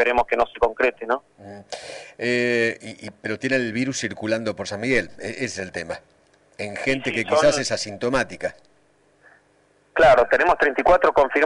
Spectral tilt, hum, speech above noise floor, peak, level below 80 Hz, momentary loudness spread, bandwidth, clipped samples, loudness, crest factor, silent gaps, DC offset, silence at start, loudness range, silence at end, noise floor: -4 dB/octave; 50 Hz at -65 dBFS; 39 dB; -8 dBFS; -46 dBFS; 17 LU; 11 kHz; under 0.1%; -21 LUFS; 14 dB; none; under 0.1%; 0 s; 5 LU; 0 s; -60 dBFS